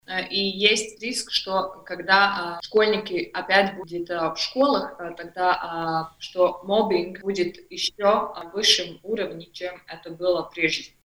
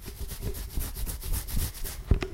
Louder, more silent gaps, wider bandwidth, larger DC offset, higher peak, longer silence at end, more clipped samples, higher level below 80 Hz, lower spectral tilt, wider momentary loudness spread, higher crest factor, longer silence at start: first, -23 LUFS vs -34 LUFS; neither; first, over 20 kHz vs 16.5 kHz; neither; first, -2 dBFS vs -10 dBFS; first, 0.15 s vs 0 s; neither; second, -60 dBFS vs -32 dBFS; second, -3 dB/octave vs -4.5 dB/octave; first, 14 LU vs 7 LU; about the same, 22 dB vs 22 dB; about the same, 0.1 s vs 0 s